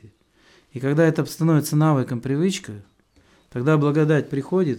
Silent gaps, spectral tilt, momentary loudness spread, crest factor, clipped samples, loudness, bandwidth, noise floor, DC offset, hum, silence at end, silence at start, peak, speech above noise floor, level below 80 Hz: none; -7 dB/octave; 14 LU; 14 dB; under 0.1%; -21 LUFS; 16.5 kHz; -58 dBFS; under 0.1%; none; 0 s; 0.75 s; -6 dBFS; 38 dB; -62 dBFS